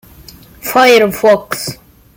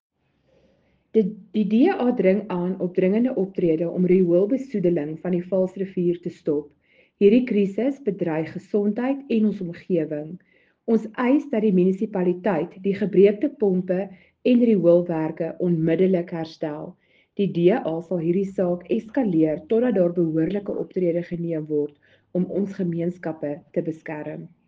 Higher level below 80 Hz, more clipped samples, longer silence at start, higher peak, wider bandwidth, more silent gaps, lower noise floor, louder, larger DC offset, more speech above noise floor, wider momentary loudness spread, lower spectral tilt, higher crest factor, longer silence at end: first, -46 dBFS vs -64 dBFS; neither; second, 0.65 s vs 1.15 s; first, 0 dBFS vs -4 dBFS; first, 17 kHz vs 7.2 kHz; neither; second, -38 dBFS vs -64 dBFS; first, -11 LUFS vs -23 LUFS; neither; second, 28 dB vs 42 dB; first, 15 LU vs 11 LU; second, -3.5 dB/octave vs -9.5 dB/octave; about the same, 14 dB vs 18 dB; first, 0.45 s vs 0.2 s